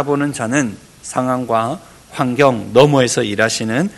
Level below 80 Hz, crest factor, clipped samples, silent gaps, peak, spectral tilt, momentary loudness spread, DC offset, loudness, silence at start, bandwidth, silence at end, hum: -52 dBFS; 16 dB; 0.3%; none; 0 dBFS; -5 dB/octave; 12 LU; under 0.1%; -16 LUFS; 0 s; 12.5 kHz; 0 s; none